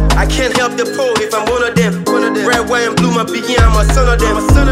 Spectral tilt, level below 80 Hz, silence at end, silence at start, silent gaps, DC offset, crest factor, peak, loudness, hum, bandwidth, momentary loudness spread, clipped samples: -5 dB/octave; -16 dBFS; 0 s; 0 s; none; under 0.1%; 12 dB; 0 dBFS; -13 LUFS; none; 15.5 kHz; 4 LU; under 0.1%